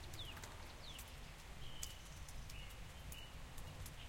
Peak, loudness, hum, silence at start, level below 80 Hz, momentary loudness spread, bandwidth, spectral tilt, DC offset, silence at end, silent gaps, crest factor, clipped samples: -28 dBFS; -53 LUFS; none; 0 s; -56 dBFS; 4 LU; 16.5 kHz; -3 dB/octave; under 0.1%; 0 s; none; 24 dB; under 0.1%